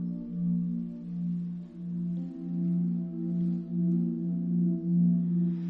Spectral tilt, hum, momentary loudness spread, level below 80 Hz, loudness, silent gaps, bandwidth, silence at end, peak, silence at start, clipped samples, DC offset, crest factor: -13 dB/octave; none; 9 LU; -66 dBFS; -30 LUFS; none; 1.2 kHz; 0 s; -18 dBFS; 0 s; under 0.1%; under 0.1%; 12 dB